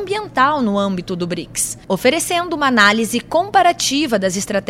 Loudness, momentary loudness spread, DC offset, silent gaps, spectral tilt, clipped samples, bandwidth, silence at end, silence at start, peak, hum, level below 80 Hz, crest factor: -16 LUFS; 9 LU; under 0.1%; none; -3 dB/octave; under 0.1%; 16.5 kHz; 0.05 s; 0 s; 0 dBFS; none; -48 dBFS; 16 dB